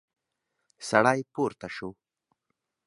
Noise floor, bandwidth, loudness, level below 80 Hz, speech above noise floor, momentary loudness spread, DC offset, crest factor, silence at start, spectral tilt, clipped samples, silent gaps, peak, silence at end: -82 dBFS; 11.5 kHz; -27 LUFS; -68 dBFS; 55 dB; 17 LU; under 0.1%; 26 dB; 0.8 s; -5 dB/octave; under 0.1%; none; -4 dBFS; 0.95 s